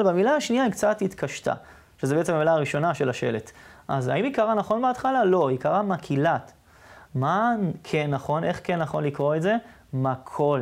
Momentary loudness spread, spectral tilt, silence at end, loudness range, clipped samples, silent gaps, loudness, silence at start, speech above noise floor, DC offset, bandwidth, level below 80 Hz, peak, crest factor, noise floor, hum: 8 LU; -6.5 dB/octave; 0 s; 2 LU; under 0.1%; none; -25 LUFS; 0 s; 26 dB; under 0.1%; 15.5 kHz; -60 dBFS; -8 dBFS; 16 dB; -50 dBFS; none